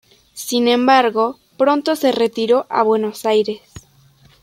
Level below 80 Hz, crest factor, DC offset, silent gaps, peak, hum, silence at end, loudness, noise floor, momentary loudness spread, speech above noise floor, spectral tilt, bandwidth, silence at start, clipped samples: -60 dBFS; 16 dB; under 0.1%; none; -2 dBFS; none; 0.65 s; -16 LUFS; -51 dBFS; 9 LU; 35 dB; -3.5 dB/octave; 16 kHz; 0.35 s; under 0.1%